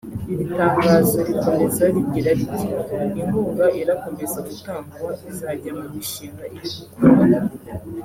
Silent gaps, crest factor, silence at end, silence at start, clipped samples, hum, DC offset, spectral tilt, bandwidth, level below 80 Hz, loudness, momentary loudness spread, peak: none; 20 dB; 0 s; 0.05 s; under 0.1%; none; under 0.1%; -6.5 dB/octave; 16.5 kHz; -50 dBFS; -20 LUFS; 16 LU; 0 dBFS